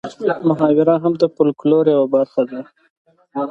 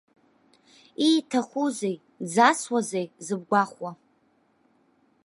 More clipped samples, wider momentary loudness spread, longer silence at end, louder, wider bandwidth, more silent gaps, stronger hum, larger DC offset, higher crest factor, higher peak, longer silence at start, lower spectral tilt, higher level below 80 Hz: neither; second, 11 LU vs 15 LU; second, 0 s vs 1.3 s; first, -16 LUFS vs -25 LUFS; second, 7.6 kHz vs 11.5 kHz; first, 2.90-3.05 s vs none; neither; neither; second, 16 dB vs 24 dB; first, 0 dBFS vs -4 dBFS; second, 0.05 s vs 1 s; first, -8.5 dB/octave vs -4 dB/octave; first, -64 dBFS vs -80 dBFS